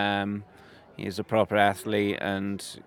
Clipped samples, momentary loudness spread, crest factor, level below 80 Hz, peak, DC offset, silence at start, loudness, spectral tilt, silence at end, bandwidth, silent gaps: under 0.1%; 12 LU; 22 dB; -68 dBFS; -6 dBFS; under 0.1%; 0 s; -27 LUFS; -5 dB/octave; 0.1 s; 17 kHz; none